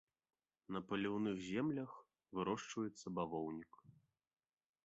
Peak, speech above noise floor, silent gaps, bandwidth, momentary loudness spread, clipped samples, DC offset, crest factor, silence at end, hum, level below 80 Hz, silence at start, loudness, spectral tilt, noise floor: -26 dBFS; 27 dB; none; 7.6 kHz; 12 LU; under 0.1%; under 0.1%; 18 dB; 0.95 s; none; -76 dBFS; 0.7 s; -44 LUFS; -5.5 dB/octave; -70 dBFS